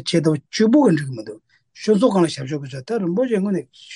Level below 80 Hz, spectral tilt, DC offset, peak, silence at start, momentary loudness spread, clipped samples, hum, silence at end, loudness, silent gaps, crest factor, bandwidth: -64 dBFS; -6.5 dB/octave; under 0.1%; -4 dBFS; 0 s; 13 LU; under 0.1%; none; 0 s; -19 LUFS; none; 16 dB; 11.5 kHz